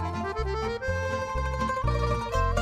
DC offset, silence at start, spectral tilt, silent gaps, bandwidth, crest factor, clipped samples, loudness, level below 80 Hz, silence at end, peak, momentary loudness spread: under 0.1%; 0 s; -6 dB/octave; none; 13.5 kHz; 14 dB; under 0.1%; -29 LUFS; -34 dBFS; 0 s; -14 dBFS; 3 LU